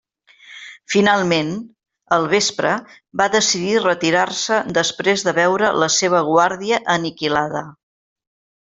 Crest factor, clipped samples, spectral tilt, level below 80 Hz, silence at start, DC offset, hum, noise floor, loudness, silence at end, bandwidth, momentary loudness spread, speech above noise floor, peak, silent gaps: 18 dB; under 0.1%; -3 dB/octave; -60 dBFS; 0.5 s; under 0.1%; none; -47 dBFS; -17 LUFS; 0.95 s; 8.2 kHz; 10 LU; 29 dB; 0 dBFS; none